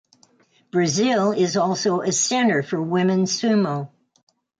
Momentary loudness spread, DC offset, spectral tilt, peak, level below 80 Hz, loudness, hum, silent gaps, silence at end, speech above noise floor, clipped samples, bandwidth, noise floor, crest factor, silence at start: 6 LU; under 0.1%; -4.5 dB/octave; -8 dBFS; -66 dBFS; -20 LUFS; none; none; 0.75 s; 39 dB; under 0.1%; 9.4 kHz; -59 dBFS; 14 dB; 0.75 s